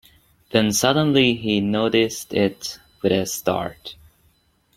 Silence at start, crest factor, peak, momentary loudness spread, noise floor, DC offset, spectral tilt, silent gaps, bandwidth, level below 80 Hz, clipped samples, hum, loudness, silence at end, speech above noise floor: 0.55 s; 20 dB; -2 dBFS; 15 LU; -62 dBFS; under 0.1%; -4 dB/octave; none; 16.5 kHz; -54 dBFS; under 0.1%; none; -20 LUFS; 0.85 s; 42 dB